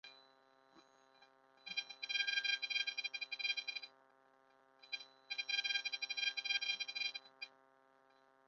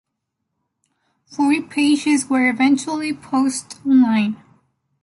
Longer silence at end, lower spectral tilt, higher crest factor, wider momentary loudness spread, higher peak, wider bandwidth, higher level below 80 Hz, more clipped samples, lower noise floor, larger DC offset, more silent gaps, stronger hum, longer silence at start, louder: first, 1 s vs 0.7 s; second, 6 dB/octave vs -4 dB/octave; first, 22 dB vs 14 dB; first, 15 LU vs 9 LU; second, -22 dBFS vs -4 dBFS; second, 7.2 kHz vs 11.5 kHz; second, under -90 dBFS vs -66 dBFS; neither; second, -71 dBFS vs -77 dBFS; neither; neither; neither; second, 0.05 s vs 1.3 s; second, -39 LUFS vs -18 LUFS